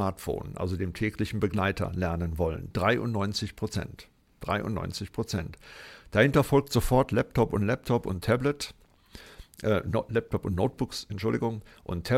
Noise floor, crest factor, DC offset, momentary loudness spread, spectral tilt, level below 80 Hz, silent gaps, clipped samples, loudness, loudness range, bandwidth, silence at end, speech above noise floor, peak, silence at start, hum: -51 dBFS; 22 dB; under 0.1%; 12 LU; -6 dB/octave; -46 dBFS; none; under 0.1%; -29 LUFS; 5 LU; 16.5 kHz; 0 s; 23 dB; -8 dBFS; 0 s; none